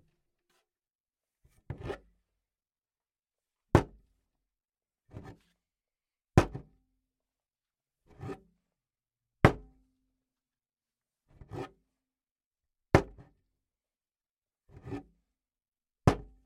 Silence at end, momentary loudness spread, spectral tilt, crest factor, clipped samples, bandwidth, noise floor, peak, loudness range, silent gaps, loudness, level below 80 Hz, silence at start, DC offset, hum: 0.25 s; 22 LU; -7 dB/octave; 36 dB; under 0.1%; 15 kHz; under -90 dBFS; -2 dBFS; 14 LU; 12.31-12.35 s, 12.46-12.51 s, 14.31-14.37 s, 15.68-15.72 s; -29 LUFS; -50 dBFS; 1.7 s; under 0.1%; none